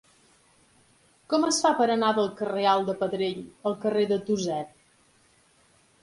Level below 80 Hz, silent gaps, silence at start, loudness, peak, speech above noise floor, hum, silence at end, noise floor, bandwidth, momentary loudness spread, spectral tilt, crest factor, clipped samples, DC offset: -68 dBFS; none; 1.3 s; -26 LUFS; -8 dBFS; 37 dB; none; 1.35 s; -62 dBFS; 11.5 kHz; 9 LU; -4 dB/octave; 18 dB; under 0.1%; under 0.1%